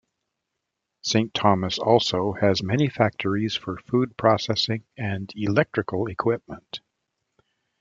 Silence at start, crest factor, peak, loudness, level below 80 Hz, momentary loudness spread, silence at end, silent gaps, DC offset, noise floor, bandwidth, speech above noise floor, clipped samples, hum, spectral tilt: 1.05 s; 22 dB; -2 dBFS; -24 LUFS; -60 dBFS; 10 LU; 1.05 s; none; under 0.1%; -82 dBFS; 7.6 kHz; 58 dB; under 0.1%; none; -5.5 dB/octave